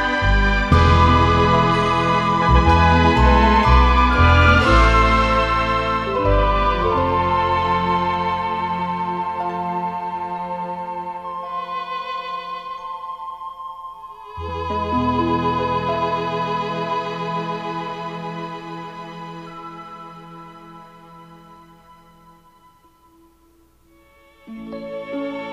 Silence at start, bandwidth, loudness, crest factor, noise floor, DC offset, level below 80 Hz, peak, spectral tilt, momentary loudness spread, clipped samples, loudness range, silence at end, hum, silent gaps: 0 s; 9.2 kHz; -18 LUFS; 18 dB; -55 dBFS; under 0.1%; -26 dBFS; -2 dBFS; -6.5 dB/octave; 20 LU; under 0.1%; 20 LU; 0 s; none; none